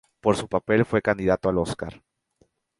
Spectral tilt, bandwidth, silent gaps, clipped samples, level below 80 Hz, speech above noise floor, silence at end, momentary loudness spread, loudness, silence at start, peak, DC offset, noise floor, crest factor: -6.5 dB/octave; 11.5 kHz; none; under 0.1%; -48 dBFS; 43 dB; 0.85 s; 9 LU; -24 LUFS; 0.25 s; -4 dBFS; under 0.1%; -66 dBFS; 22 dB